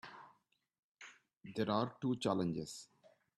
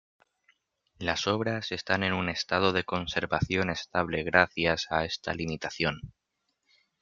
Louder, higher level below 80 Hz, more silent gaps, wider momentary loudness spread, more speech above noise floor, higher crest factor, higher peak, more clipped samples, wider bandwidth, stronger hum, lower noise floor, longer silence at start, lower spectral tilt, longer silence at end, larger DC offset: second, -39 LUFS vs -28 LUFS; second, -76 dBFS vs -56 dBFS; first, 0.79-0.95 s, 1.37-1.41 s vs none; first, 22 LU vs 8 LU; second, 37 dB vs 50 dB; second, 22 dB vs 28 dB; second, -20 dBFS vs -2 dBFS; neither; first, 12.5 kHz vs 7.6 kHz; neither; second, -75 dBFS vs -79 dBFS; second, 0.05 s vs 1 s; first, -6 dB/octave vs -4.5 dB/octave; second, 0.5 s vs 0.95 s; neither